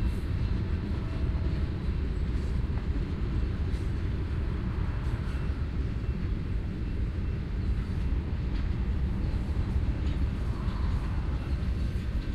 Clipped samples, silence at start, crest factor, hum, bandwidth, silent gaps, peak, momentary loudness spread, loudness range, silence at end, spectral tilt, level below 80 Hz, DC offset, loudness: under 0.1%; 0 s; 12 dB; none; 8.2 kHz; none; -18 dBFS; 2 LU; 1 LU; 0 s; -8.5 dB/octave; -32 dBFS; under 0.1%; -32 LUFS